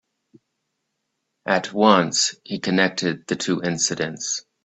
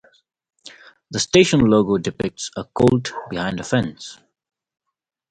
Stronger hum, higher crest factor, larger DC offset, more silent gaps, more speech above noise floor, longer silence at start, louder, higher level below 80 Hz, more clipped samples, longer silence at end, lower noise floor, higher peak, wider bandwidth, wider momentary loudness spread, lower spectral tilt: neither; about the same, 22 dB vs 20 dB; neither; neither; first, 56 dB vs 26 dB; first, 1.45 s vs 0.65 s; about the same, -21 LUFS vs -19 LUFS; second, -64 dBFS vs -48 dBFS; neither; second, 0.25 s vs 1.15 s; first, -77 dBFS vs -45 dBFS; about the same, 0 dBFS vs 0 dBFS; second, 8.4 kHz vs 11 kHz; second, 10 LU vs 15 LU; second, -3 dB/octave vs -5 dB/octave